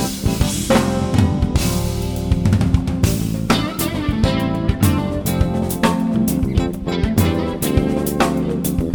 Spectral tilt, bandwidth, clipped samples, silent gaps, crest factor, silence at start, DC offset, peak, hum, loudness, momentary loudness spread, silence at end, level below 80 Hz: -6 dB/octave; over 20 kHz; under 0.1%; none; 16 dB; 0 s; under 0.1%; 0 dBFS; none; -18 LUFS; 4 LU; 0 s; -26 dBFS